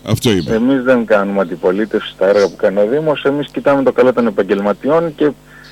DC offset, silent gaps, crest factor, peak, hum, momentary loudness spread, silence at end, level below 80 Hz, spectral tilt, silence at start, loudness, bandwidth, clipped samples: under 0.1%; none; 10 dB; -4 dBFS; none; 5 LU; 0.05 s; -46 dBFS; -6 dB/octave; 0.05 s; -14 LUFS; 15.5 kHz; under 0.1%